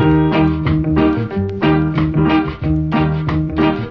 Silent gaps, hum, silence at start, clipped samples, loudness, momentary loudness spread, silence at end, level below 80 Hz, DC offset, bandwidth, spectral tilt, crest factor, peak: none; none; 0 s; under 0.1%; -16 LUFS; 5 LU; 0 s; -28 dBFS; under 0.1%; 5.8 kHz; -9.5 dB/octave; 12 dB; -2 dBFS